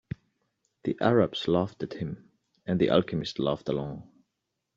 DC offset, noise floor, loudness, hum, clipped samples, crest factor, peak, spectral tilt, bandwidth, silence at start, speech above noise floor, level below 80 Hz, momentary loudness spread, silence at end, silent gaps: under 0.1%; -82 dBFS; -28 LUFS; none; under 0.1%; 22 dB; -8 dBFS; -7.5 dB/octave; 7.6 kHz; 0.85 s; 55 dB; -60 dBFS; 18 LU; 0.75 s; none